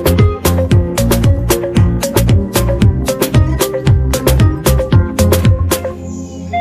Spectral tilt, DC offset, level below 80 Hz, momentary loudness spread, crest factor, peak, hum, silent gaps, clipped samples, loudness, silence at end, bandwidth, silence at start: -6 dB/octave; under 0.1%; -20 dBFS; 5 LU; 12 dB; 0 dBFS; none; none; under 0.1%; -13 LUFS; 0 s; 15.5 kHz; 0 s